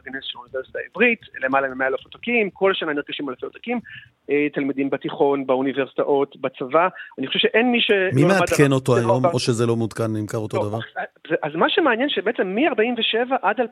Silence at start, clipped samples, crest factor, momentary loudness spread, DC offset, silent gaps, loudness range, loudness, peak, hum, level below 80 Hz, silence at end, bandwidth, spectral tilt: 0.05 s; under 0.1%; 18 dB; 12 LU; under 0.1%; none; 5 LU; -21 LUFS; -2 dBFS; none; -60 dBFS; 0 s; 15 kHz; -5.5 dB/octave